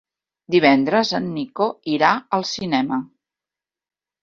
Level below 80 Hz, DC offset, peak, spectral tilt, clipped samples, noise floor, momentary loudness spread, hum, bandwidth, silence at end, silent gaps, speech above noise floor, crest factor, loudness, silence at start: -64 dBFS; under 0.1%; -2 dBFS; -5 dB/octave; under 0.1%; under -90 dBFS; 9 LU; none; 7.4 kHz; 1.15 s; none; over 71 dB; 20 dB; -19 LUFS; 0.5 s